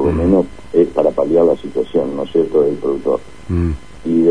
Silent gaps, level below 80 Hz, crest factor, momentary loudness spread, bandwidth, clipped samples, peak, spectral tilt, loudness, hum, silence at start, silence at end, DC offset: none; -34 dBFS; 14 dB; 7 LU; 10.5 kHz; under 0.1%; 0 dBFS; -9 dB/octave; -16 LUFS; none; 0 s; 0 s; 2%